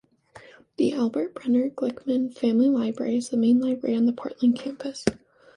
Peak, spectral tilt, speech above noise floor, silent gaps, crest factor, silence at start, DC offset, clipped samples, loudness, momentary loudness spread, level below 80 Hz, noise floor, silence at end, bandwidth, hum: -6 dBFS; -6 dB/octave; 27 dB; none; 20 dB; 0.35 s; under 0.1%; under 0.1%; -25 LUFS; 8 LU; -60 dBFS; -51 dBFS; 0.4 s; 11 kHz; none